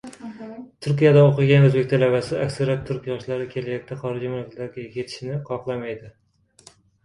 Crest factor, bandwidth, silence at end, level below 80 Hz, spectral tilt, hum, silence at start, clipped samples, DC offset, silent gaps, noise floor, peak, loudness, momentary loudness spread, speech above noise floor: 18 dB; 11 kHz; 0.95 s; -56 dBFS; -8 dB/octave; none; 0.05 s; under 0.1%; under 0.1%; none; -53 dBFS; -4 dBFS; -21 LUFS; 18 LU; 32 dB